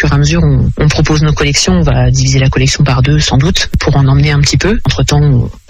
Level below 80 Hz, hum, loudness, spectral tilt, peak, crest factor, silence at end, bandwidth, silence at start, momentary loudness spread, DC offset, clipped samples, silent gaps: -18 dBFS; none; -9 LUFS; -5 dB/octave; 0 dBFS; 8 dB; 0.1 s; 10.5 kHz; 0 s; 2 LU; under 0.1%; under 0.1%; none